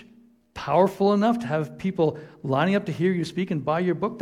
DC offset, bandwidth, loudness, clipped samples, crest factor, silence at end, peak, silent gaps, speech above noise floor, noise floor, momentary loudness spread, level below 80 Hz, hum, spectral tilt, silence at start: under 0.1%; 13 kHz; -24 LUFS; under 0.1%; 18 dB; 0 s; -6 dBFS; none; 32 dB; -55 dBFS; 8 LU; -60 dBFS; none; -7.5 dB/octave; 0 s